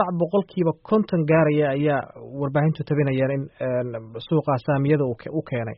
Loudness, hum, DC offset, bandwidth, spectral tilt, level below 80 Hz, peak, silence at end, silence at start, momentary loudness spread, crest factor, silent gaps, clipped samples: -23 LUFS; none; under 0.1%; 5.6 kHz; -7.5 dB/octave; -58 dBFS; -6 dBFS; 0 s; 0 s; 8 LU; 16 dB; none; under 0.1%